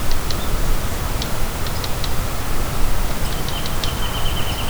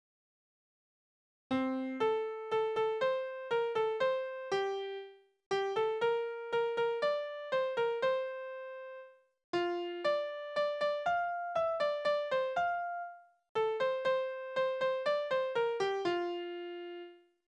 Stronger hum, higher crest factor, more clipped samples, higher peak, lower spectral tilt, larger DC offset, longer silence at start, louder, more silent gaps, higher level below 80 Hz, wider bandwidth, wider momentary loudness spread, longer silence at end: neither; about the same, 14 dB vs 14 dB; neither; first, -4 dBFS vs -20 dBFS; about the same, -4 dB/octave vs -4.5 dB/octave; neither; second, 0 s vs 1.5 s; first, -24 LUFS vs -34 LUFS; second, none vs 5.46-5.51 s, 9.44-9.53 s, 13.49-13.55 s; first, -22 dBFS vs -78 dBFS; first, over 20 kHz vs 9.2 kHz; second, 2 LU vs 11 LU; second, 0 s vs 0.35 s